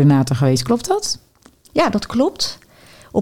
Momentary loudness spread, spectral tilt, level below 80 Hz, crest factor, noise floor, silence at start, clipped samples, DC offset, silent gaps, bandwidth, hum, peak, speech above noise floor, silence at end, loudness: 8 LU; -5.5 dB/octave; -48 dBFS; 16 dB; -50 dBFS; 0 s; under 0.1%; 0.7%; none; 16 kHz; none; -2 dBFS; 34 dB; 0 s; -18 LUFS